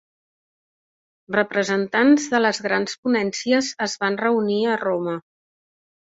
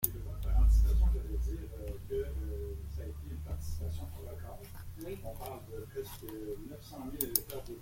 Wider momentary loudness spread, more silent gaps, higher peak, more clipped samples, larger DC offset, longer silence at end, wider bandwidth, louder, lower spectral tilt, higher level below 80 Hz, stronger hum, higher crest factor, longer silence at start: second, 8 LU vs 16 LU; first, 2.98-3.03 s vs none; about the same, -4 dBFS vs -4 dBFS; neither; neither; first, 0.95 s vs 0 s; second, 8 kHz vs 16.5 kHz; first, -21 LUFS vs -37 LUFS; second, -4 dB/octave vs -5.5 dB/octave; second, -68 dBFS vs -36 dBFS; neither; second, 18 dB vs 30 dB; first, 1.3 s vs 0 s